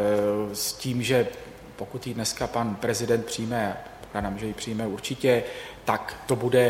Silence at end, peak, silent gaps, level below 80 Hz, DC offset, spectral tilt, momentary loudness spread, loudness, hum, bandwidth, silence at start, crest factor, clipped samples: 0 s; -6 dBFS; none; -52 dBFS; under 0.1%; -4.5 dB/octave; 12 LU; -27 LUFS; none; 16.5 kHz; 0 s; 20 dB; under 0.1%